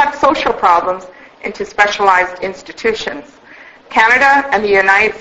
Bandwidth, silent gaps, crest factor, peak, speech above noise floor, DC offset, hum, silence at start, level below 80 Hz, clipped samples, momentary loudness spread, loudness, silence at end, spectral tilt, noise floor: 9 kHz; none; 14 dB; 0 dBFS; 26 dB; under 0.1%; none; 0 s; -46 dBFS; 0.1%; 15 LU; -12 LUFS; 0 s; -3 dB/octave; -39 dBFS